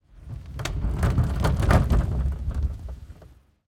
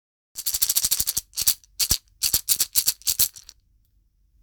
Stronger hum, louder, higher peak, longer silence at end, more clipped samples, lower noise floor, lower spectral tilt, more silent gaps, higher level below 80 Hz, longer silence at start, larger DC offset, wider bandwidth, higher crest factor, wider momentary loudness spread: neither; second, -25 LUFS vs -21 LUFS; second, -6 dBFS vs 0 dBFS; second, 0.45 s vs 1 s; neither; second, -51 dBFS vs -63 dBFS; first, -7 dB/octave vs 1 dB/octave; neither; first, -28 dBFS vs -46 dBFS; second, 0.15 s vs 0.35 s; neither; second, 15 kHz vs over 20 kHz; second, 20 dB vs 26 dB; first, 19 LU vs 5 LU